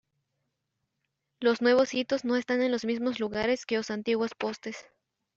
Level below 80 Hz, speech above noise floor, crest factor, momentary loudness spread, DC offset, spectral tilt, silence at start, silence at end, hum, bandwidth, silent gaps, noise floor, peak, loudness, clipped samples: -68 dBFS; 54 dB; 18 dB; 11 LU; under 0.1%; -4 dB/octave; 1.4 s; 0.55 s; none; 7.8 kHz; none; -82 dBFS; -12 dBFS; -28 LUFS; under 0.1%